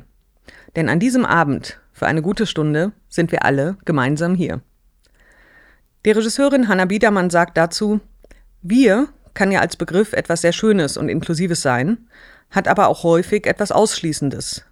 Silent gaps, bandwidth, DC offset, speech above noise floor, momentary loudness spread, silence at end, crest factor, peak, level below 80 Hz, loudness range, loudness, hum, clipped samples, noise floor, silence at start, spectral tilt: none; 15 kHz; under 0.1%; 39 dB; 8 LU; 0.1 s; 16 dB; -2 dBFS; -48 dBFS; 3 LU; -18 LUFS; none; under 0.1%; -56 dBFS; 0.75 s; -5.5 dB/octave